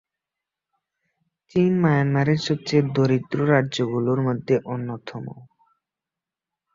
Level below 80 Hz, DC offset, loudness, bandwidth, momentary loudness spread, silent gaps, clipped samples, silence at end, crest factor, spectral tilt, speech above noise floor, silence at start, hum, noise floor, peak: -60 dBFS; under 0.1%; -22 LUFS; 7.6 kHz; 13 LU; none; under 0.1%; 1.3 s; 20 dB; -7 dB/octave; 67 dB; 1.55 s; none; -88 dBFS; -4 dBFS